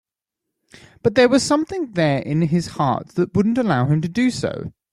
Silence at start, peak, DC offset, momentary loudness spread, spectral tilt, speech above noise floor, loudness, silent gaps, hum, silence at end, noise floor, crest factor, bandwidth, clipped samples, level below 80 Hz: 1.05 s; -2 dBFS; under 0.1%; 9 LU; -6 dB/octave; 64 dB; -19 LUFS; none; none; 0.2 s; -83 dBFS; 18 dB; 12.5 kHz; under 0.1%; -52 dBFS